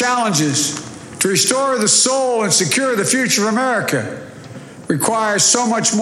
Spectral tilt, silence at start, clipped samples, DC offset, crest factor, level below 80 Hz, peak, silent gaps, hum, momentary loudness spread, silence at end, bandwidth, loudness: -2.5 dB/octave; 0 s; under 0.1%; under 0.1%; 14 dB; -60 dBFS; -2 dBFS; none; none; 17 LU; 0 s; 16.5 kHz; -15 LUFS